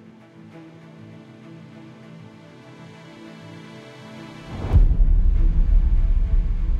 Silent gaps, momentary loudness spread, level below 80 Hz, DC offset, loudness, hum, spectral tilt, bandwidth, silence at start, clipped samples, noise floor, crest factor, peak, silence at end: none; 23 LU; -22 dBFS; under 0.1%; -22 LUFS; none; -8.5 dB/octave; 4.2 kHz; 0.55 s; under 0.1%; -45 dBFS; 16 dB; -4 dBFS; 0 s